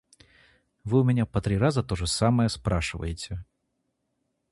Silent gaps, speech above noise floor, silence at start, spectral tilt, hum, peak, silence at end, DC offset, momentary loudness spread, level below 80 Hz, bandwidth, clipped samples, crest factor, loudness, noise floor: none; 52 dB; 0.85 s; -6 dB/octave; none; -8 dBFS; 1.1 s; under 0.1%; 13 LU; -42 dBFS; 11.5 kHz; under 0.1%; 20 dB; -26 LUFS; -77 dBFS